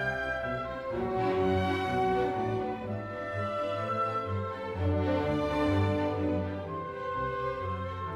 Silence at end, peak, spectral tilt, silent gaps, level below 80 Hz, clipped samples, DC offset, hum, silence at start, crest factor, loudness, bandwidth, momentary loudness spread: 0 s; -18 dBFS; -7.5 dB/octave; none; -50 dBFS; under 0.1%; under 0.1%; none; 0 s; 14 dB; -31 LUFS; 11 kHz; 7 LU